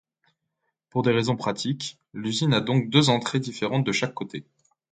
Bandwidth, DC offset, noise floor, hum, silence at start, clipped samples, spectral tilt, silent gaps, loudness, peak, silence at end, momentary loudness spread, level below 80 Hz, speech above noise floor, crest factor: 9.4 kHz; under 0.1%; -79 dBFS; none; 0.95 s; under 0.1%; -5 dB/octave; none; -25 LUFS; -4 dBFS; 0.5 s; 14 LU; -62 dBFS; 54 dB; 22 dB